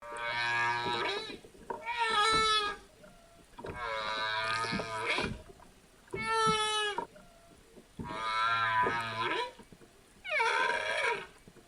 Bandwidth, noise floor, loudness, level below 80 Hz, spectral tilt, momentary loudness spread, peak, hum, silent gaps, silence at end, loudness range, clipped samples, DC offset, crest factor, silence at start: 16 kHz; -58 dBFS; -31 LUFS; -60 dBFS; -2.5 dB/octave; 16 LU; -16 dBFS; none; none; 0.1 s; 3 LU; under 0.1%; under 0.1%; 18 dB; 0 s